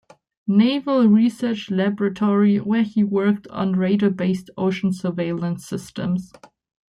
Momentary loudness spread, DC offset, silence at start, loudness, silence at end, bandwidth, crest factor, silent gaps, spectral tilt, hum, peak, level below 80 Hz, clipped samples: 9 LU; under 0.1%; 0.45 s; -20 LUFS; 0.65 s; 11 kHz; 14 dB; none; -7.5 dB/octave; none; -6 dBFS; -60 dBFS; under 0.1%